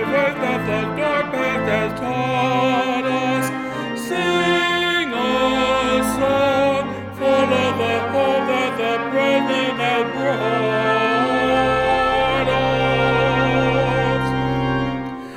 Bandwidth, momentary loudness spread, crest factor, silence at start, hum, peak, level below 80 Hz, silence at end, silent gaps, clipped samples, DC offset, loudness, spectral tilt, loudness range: 16.5 kHz; 5 LU; 14 dB; 0 s; none; -6 dBFS; -42 dBFS; 0 s; none; under 0.1%; under 0.1%; -19 LUFS; -5.5 dB/octave; 2 LU